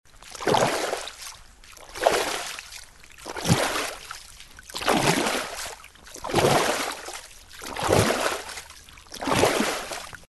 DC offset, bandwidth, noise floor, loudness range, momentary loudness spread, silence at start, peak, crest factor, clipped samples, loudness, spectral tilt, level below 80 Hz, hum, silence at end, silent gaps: under 0.1%; 12.5 kHz; -47 dBFS; 2 LU; 21 LU; 0.2 s; -2 dBFS; 24 dB; under 0.1%; -25 LUFS; -3.5 dB/octave; -50 dBFS; none; 0.05 s; none